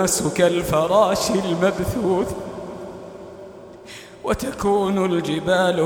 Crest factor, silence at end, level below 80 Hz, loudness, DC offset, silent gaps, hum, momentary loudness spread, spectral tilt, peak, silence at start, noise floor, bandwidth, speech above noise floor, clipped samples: 18 dB; 0 s; -44 dBFS; -20 LUFS; under 0.1%; none; none; 21 LU; -4.5 dB/octave; -4 dBFS; 0 s; -40 dBFS; over 20 kHz; 21 dB; under 0.1%